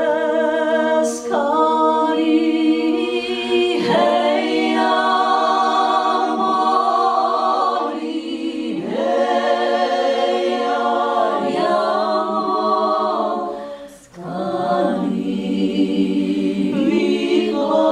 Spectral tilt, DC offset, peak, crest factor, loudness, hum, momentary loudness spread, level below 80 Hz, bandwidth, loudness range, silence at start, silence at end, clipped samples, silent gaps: -5 dB/octave; under 0.1%; -4 dBFS; 14 dB; -18 LUFS; none; 7 LU; -60 dBFS; 11.5 kHz; 4 LU; 0 s; 0 s; under 0.1%; none